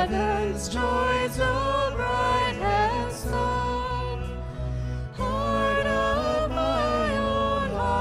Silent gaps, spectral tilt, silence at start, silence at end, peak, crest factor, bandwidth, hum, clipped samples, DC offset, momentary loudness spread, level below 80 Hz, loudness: none; -5.5 dB/octave; 0 s; 0 s; -12 dBFS; 14 dB; 15.5 kHz; none; under 0.1%; under 0.1%; 8 LU; -34 dBFS; -26 LUFS